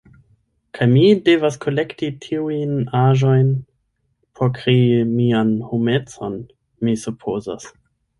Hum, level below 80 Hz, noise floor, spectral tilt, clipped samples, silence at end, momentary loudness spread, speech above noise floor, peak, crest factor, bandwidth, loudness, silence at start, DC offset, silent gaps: none; -56 dBFS; -68 dBFS; -7.5 dB/octave; under 0.1%; 0.5 s; 14 LU; 51 dB; -2 dBFS; 16 dB; 11.5 kHz; -18 LUFS; 0.75 s; under 0.1%; none